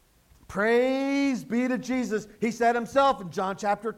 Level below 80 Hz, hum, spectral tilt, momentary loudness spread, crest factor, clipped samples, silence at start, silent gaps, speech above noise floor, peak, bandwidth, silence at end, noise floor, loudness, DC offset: -60 dBFS; none; -5 dB/octave; 8 LU; 16 dB; under 0.1%; 0.5 s; none; 31 dB; -10 dBFS; 15 kHz; 0.05 s; -56 dBFS; -26 LUFS; under 0.1%